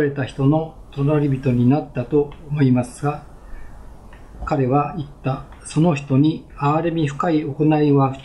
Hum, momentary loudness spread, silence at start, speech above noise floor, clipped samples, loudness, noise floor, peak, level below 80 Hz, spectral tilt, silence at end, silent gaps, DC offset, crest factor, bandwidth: none; 9 LU; 0 s; 20 dB; under 0.1%; -20 LUFS; -39 dBFS; -6 dBFS; -42 dBFS; -8 dB/octave; 0 s; none; under 0.1%; 14 dB; 11 kHz